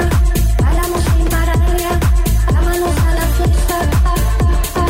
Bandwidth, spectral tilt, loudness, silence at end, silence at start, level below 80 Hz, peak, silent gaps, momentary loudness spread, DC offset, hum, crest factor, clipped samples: 16.5 kHz; -5.5 dB/octave; -15 LUFS; 0 s; 0 s; -14 dBFS; -4 dBFS; none; 1 LU; under 0.1%; none; 8 dB; under 0.1%